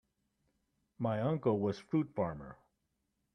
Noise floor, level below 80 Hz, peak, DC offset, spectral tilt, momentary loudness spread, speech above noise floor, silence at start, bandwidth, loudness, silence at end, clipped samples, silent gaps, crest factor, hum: -83 dBFS; -68 dBFS; -18 dBFS; under 0.1%; -9 dB/octave; 10 LU; 48 dB; 1 s; 9.8 kHz; -35 LUFS; 0.8 s; under 0.1%; none; 20 dB; none